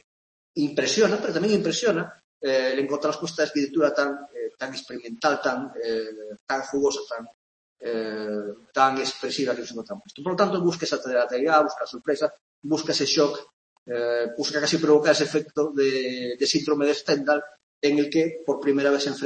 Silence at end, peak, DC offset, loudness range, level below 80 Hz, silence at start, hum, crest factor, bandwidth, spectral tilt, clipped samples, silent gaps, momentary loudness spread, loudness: 0 s; -6 dBFS; under 0.1%; 5 LU; -70 dBFS; 0.55 s; none; 20 dB; 8.8 kHz; -4 dB/octave; under 0.1%; 2.24-2.40 s, 6.41-6.47 s, 7.34-7.76 s, 12.41-12.62 s, 13.53-13.86 s, 17.63-17.81 s; 12 LU; -24 LUFS